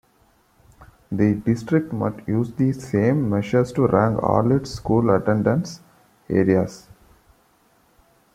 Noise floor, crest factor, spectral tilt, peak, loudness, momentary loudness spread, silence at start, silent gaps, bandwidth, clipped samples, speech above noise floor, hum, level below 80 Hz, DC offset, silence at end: -60 dBFS; 18 dB; -8 dB/octave; -2 dBFS; -21 LUFS; 7 LU; 0.8 s; none; 14 kHz; under 0.1%; 40 dB; none; -50 dBFS; under 0.1%; 1.55 s